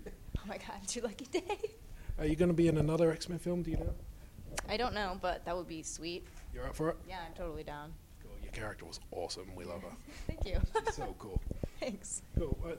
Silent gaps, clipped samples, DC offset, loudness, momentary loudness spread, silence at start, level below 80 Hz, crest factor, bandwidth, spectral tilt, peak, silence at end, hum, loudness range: none; under 0.1%; under 0.1%; -38 LUFS; 16 LU; 0 s; -44 dBFS; 22 dB; 16 kHz; -5.5 dB/octave; -16 dBFS; 0 s; none; 9 LU